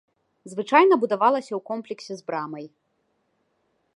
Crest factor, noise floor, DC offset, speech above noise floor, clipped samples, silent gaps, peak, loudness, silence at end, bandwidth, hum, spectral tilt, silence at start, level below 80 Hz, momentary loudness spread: 22 dB; -72 dBFS; under 0.1%; 49 dB; under 0.1%; none; -2 dBFS; -22 LUFS; 1.3 s; 11 kHz; none; -5.5 dB/octave; 0.45 s; -84 dBFS; 18 LU